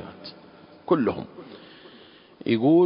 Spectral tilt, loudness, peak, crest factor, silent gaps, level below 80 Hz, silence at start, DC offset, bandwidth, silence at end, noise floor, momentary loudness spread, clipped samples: -11.5 dB/octave; -25 LUFS; -8 dBFS; 18 dB; none; -62 dBFS; 0 s; under 0.1%; 5.4 kHz; 0 s; -50 dBFS; 23 LU; under 0.1%